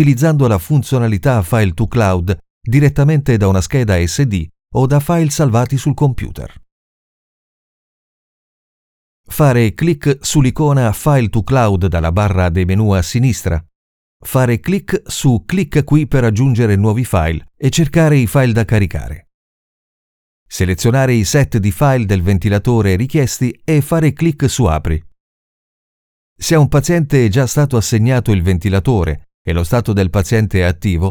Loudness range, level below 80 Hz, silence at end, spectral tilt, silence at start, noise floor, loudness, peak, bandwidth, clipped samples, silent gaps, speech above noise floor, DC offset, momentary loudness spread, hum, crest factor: 4 LU; -32 dBFS; 0 s; -6.5 dB/octave; 0 s; under -90 dBFS; -14 LUFS; 0 dBFS; 18.5 kHz; under 0.1%; 2.50-2.61 s, 6.72-9.24 s, 13.75-14.20 s, 19.34-20.46 s, 25.20-26.36 s, 29.34-29.45 s; over 77 dB; under 0.1%; 7 LU; none; 14 dB